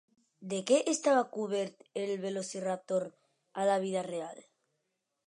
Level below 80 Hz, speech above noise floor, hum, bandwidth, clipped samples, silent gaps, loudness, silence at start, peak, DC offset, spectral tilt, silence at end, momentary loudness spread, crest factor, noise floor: -88 dBFS; 51 dB; none; 11.5 kHz; under 0.1%; none; -33 LUFS; 0.4 s; -14 dBFS; under 0.1%; -4 dB/octave; 0.85 s; 13 LU; 20 dB; -83 dBFS